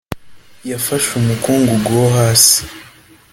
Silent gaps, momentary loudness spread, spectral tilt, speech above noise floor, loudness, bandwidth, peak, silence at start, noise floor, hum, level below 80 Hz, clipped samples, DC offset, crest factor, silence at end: none; 22 LU; -4 dB/octave; 23 dB; -12 LUFS; 17 kHz; 0 dBFS; 0.1 s; -36 dBFS; none; -44 dBFS; under 0.1%; under 0.1%; 16 dB; 0.5 s